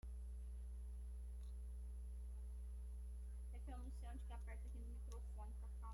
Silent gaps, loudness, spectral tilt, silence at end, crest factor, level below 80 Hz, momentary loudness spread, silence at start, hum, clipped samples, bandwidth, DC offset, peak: none; -54 LUFS; -7 dB/octave; 0 s; 8 dB; -50 dBFS; 1 LU; 0.05 s; 60 Hz at -50 dBFS; under 0.1%; 11.5 kHz; under 0.1%; -42 dBFS